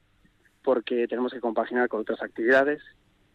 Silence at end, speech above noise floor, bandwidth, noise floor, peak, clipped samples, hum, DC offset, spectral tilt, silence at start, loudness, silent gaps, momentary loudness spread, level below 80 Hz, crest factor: 0.5 s; 37 dB; 8 kHz; -63 dBFS; -10 dBFS; under 0.1%; none; under 0.1%; -6 dB/octave; 0.65 s; -26 LUFS; none; 10 LU; -68 dBFS; 16 dB